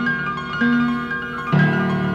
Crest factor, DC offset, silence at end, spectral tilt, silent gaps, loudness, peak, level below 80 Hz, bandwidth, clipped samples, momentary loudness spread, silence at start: 14 dB; under 0.1%; 0 s; -7.5 dB/octave; none; -20 LUFS; -6 dBFS; -48 dBFS; 7.2 kHz; under 0.1%; 7 LU; 0 s